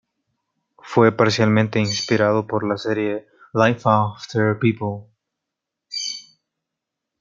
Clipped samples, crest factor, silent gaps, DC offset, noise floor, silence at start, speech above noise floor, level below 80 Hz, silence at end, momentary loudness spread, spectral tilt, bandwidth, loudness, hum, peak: under 0.1%; 20 dB; none; under 0.1%; -83 dBFS; 0.85 s; 64 dB; -64 dBFS; 1 s; 12 LU; -5.5 dB/octave; 7.6 kHz; -20 LUFS; none; -2 dBFS